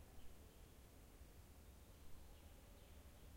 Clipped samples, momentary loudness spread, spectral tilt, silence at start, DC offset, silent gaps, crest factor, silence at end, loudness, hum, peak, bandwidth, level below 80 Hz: under 0.1%; 1 LU; -4.5 dB/octave; 0 s; under 0.1%; none; 16 dB; 0 s; -65 LUFS; none; -44 dBFS; 16.5 kHz; -64 dBFS